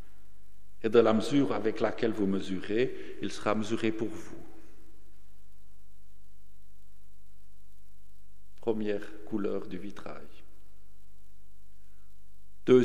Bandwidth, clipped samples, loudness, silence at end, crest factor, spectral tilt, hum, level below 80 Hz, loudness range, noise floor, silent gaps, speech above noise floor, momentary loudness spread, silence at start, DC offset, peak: 13 kHz; under 0.1%; -31 LUFS; 0 s; 24 dB; -6.5 dB/octave; 50 Hz at -60 dBFS; -60 dBFS; 13 LU; -61 dBFS; none; 30 dB; 19 LU; 0.85 s; 2%; -8 dBFS